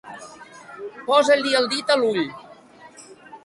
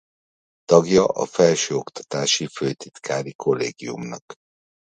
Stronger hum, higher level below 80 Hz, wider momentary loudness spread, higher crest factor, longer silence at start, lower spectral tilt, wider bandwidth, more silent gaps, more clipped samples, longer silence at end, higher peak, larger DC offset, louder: neither; second, -68 dBFS vs -60 dBFS; first, 24 LU vs 15 LU; about the same, 20 dB vs 22 dB; second, 0.05 s vs 0.7 s; about the same, -3 dB/octave vs -4 dB/octave; first, 11.5 kHz vs 9.4 kHz; second, none vs 3.35-3.39 s, 4.22-4.28 s; neither; second, 0.05 s vs 0.55 s; second, -4 dBFS vs 0 dBFS; neither; about the same, -20 LUFS vs -21 LUFS